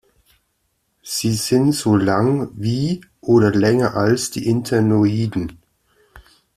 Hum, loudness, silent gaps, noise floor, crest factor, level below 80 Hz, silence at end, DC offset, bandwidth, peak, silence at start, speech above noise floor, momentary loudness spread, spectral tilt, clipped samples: none; -18 LUFS; none; -68 dBFS; 16 dB; -50 dBFS; 0.35 s; under 0.1%; 15 kHz; -2 dBFS; 1.05 s; 52 dB; 8 LU; -6 dB/octave; under 0.1%